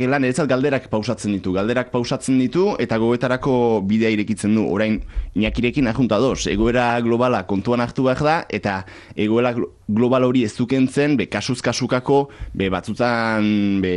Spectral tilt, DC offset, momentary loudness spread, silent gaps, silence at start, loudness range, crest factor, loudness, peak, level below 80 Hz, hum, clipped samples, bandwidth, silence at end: -6 dB/octave; under 0.1%; 5 LU; none; 0 s; 1 LU; 14 dB; -19 LUFS; -6 dBFS; -38 dBFS; none; under 0.1%; 11 kHz; 0 s